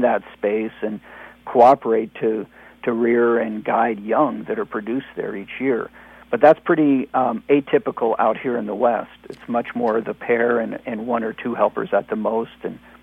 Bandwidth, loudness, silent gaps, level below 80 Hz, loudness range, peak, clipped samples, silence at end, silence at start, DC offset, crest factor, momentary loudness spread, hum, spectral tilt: 6.2 kHz; -20 LUFS; none; -60 dBFS; 4 LU; 0 dBFS; under 0.1%; 0.25 s; 0 s; under 0.1%; 20 dB; 14 LU; none; -8 dB/octave